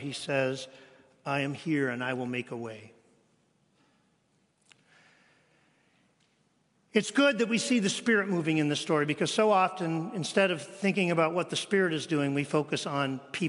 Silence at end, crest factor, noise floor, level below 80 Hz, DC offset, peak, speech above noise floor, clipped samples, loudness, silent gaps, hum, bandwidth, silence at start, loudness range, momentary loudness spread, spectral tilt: 0 s; 22 dB; -71 dBFS; -78 dBFS; under 0.1%; -8 dBFS; 42 dB; under 0.1%; -28 LUFS; none; none; 11 kHz; 0 s; 11 LU; 9 LU; -4.5 dB/octave